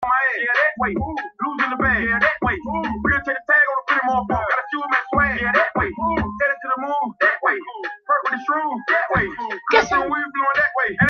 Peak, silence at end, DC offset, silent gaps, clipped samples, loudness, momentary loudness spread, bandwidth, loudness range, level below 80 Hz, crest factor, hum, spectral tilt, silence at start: 0 dBFS; 0 s; under 0.1%; none; under 0.1%; -19 LUFS; 7 LU; 7 kHz; 2 LU; -42 dBFS; 20 dB; none; -5.5 dB/octave; 0 s